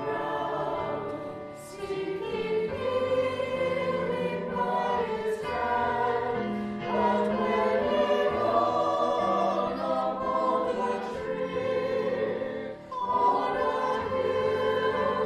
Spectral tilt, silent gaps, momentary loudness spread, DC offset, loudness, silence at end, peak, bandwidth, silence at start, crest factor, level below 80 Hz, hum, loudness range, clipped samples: -6 dB/octave; none; 7 LU; under 0.1%; -28 LUFS; 0 s; -12 dBFS; 12.5 kHz; 0 s; 16 dB; -60 dBFS; none; 4 LU; under 0.1%